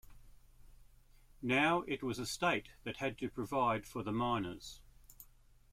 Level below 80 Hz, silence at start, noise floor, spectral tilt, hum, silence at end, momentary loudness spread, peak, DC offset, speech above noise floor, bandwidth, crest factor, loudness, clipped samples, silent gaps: -60 dBFS; 0.05 s; -63 dBFS; -5 dB/octave; none; 0.5 s; 18 LU; -18 dBFS; under 0.1%; 27 dB; 16.5 kHz; 20 dB; -36 LUFS; under 0.1%; none